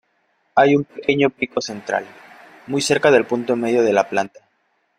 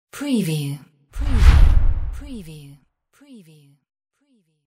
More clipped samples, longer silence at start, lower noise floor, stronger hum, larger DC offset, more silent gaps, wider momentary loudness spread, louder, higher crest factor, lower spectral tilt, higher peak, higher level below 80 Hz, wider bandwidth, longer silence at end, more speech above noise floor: neither; first, 0.55 s vs 0.15 s; about the same, -66 dBFS vs -64 dBFS; neither; neither; neither; second, 10 LU vs 23 LU; about the same, -19 LUFS vs -20 LUFS; about the same, 18 dB vs 18 dB; second, -4.5 dB/octave vs -6.5 dB/octave; about the same, -2 dBFS vs 0 dBFS; second, -62 dBFS vs -20 dBFS; about the same, 14.5 kHz vs 15 kHz; second, 0.7 s vs 2.05 s; first, 48 dB vs 37 dB